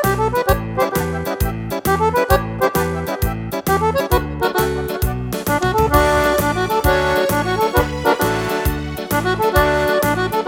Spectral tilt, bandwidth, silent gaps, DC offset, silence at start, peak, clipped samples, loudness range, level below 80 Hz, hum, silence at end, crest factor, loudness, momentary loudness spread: -5 dB/octave; 18.5 kHz; none; under 0.1%; 0 s; -2 dBFS; under 0.1%; 3 LU; -28 dBFS; none; 0 s; 16 dB; -18 LUFS; 7 LU